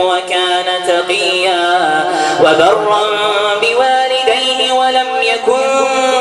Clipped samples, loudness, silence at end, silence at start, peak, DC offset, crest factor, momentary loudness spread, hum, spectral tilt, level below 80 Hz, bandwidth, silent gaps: under 0.1%; -12 LUFS; 0 s; 0 s; 0 dBFS; under 0.1%; 12 dB; 3 LU; none; -2 dB/octave; -58 dBFS; 12.5 kHz; none